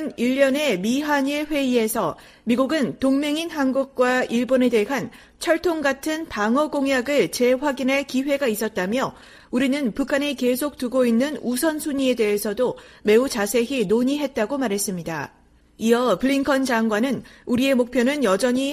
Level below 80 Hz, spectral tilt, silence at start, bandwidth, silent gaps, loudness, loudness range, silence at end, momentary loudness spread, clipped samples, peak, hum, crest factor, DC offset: -54 dBFS; -4 dB/octave; 0 s; 15.5 kHz; none; -22 LUFS; 1 LU; 0 s; 6 LU; under 0.1%; -4 dBFS; none; 16 dB; under 0.1%